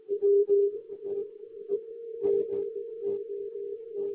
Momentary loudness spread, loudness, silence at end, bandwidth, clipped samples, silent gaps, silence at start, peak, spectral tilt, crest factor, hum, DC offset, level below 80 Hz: 14 LU; -30 LUFS; 0 s; 1.3 kHz; under 0.1%; none; 0.1 s; -16 dBFS; -11 dB/octave; 14 dB; none; under 0.1%; -76 dBFS